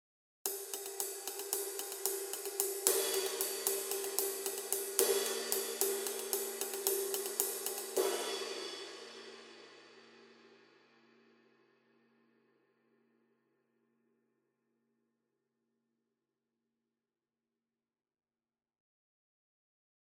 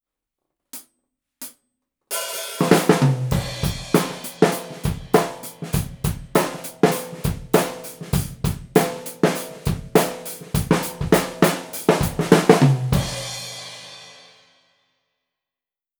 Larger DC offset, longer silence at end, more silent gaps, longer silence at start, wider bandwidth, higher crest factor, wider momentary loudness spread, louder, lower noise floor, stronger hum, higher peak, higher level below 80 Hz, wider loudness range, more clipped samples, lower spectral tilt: neither; first, 9.45 s vs 1.85 s; neither; second, 0.45 s vs 0.75 s; second, 17.5 kHz vs over 20 kHz; first, 38 dB vs 22 dB; second, 13 LU vs 17 LU; second, -35 LUFS vs -21 LUFS; about the same, under -90 dBFS vs under -90 dBFS; neither; second, -4 dBFS vs 0 dBFS; second, under -90 dBFS vs -38 dBFS; first, 11 LU vs 4 LU; neither; second, 1 dB/octave vs -5.5 dB/octave